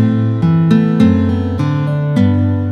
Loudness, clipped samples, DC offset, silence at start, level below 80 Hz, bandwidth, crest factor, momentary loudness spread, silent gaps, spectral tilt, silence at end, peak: -13 LUFS; under 0.1%; under 0.1%; 0 s; -42 dBFS; 6.8 kHz; 12 dB; 5 LU; none; -9.5 dB/octave; 0 s; 0 dBFS